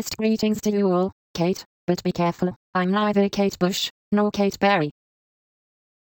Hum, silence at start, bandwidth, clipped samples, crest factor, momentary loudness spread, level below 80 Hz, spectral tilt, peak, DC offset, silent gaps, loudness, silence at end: none; 0 s; 17 kHz; under 0.1%; 16 dB; 6 LU; -56 dBFS; -5.5 dB/octave; -8 dBFS; under 0.1%; 1.12-1.34 s, 1.66-1.87 s, 2.56-2.73 s, 3.90-4.11 s; -23 LUFS; 1.1 s